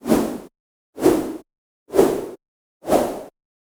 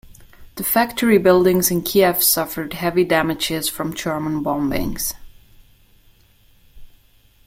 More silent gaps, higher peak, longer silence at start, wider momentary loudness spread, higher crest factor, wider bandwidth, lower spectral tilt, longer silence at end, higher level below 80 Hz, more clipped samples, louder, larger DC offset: first, 0.60-0.93 s, 1.58-1.86 s, 2.48-2.80 s vs none; about the same, -2 dBFS vs -2 dBFS; about the same, 0.05 s vs 0.05 s; first, 17 LU vs 11 LU; about the same, 20 dB vs 18 dB; first, over 20 kHz vs 16.5 kHz; first, -5.5 dB/octave vs -4 dB/octave; second, 0.45 s vs 0.6 s; second, -48 dBFS vs -42 dBFS; neither; second, -21 LUFS vs -18 LUFS; neither